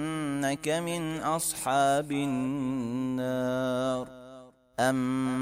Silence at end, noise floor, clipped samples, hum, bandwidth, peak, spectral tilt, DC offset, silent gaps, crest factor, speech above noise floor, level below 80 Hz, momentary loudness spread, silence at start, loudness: 0 s; -51 dBFS; under 0.1%; none; 16 kHz; -14 dBFS; -5 dB/octave; under 0.1%; none; 16 dB; 22 dB; -62 dBFS; 6 LU; 0 s; -29 LUFS